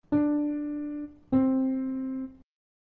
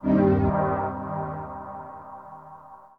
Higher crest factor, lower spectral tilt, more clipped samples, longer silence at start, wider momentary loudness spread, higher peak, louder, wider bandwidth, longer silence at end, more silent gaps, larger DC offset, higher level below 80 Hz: about the same, 16 dB vs 18 dB; about the same, -11.5 dB/octave vs -11.5 dB/octave; neither; about the same, 0.1 s vs 0 s; second, 12 LU vs 23 LU; second, -14 dBFS vs -8 dBFS; second, -29 LUFS vs -25 LUFS; second, 2.8 kHz vs 4.8 kHz; first, 0.5 s vs 0.1 s; neither; neither; second, -58 dBFS vs -44 dBFS